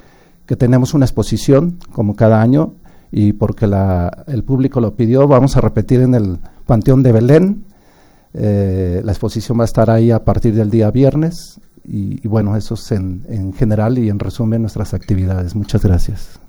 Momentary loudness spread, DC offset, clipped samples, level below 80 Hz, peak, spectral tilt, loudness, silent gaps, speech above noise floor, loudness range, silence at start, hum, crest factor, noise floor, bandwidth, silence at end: 12 LU; under 0.1%; under 0.1%; -28 dBFS; 0 dBFS; -8.5 dB/octave; -14 LUFS; none; 34 dB; 5 LU; 0.5 s; none; 14 dB; -47 dBFS; over 20 kHz; 0.15 s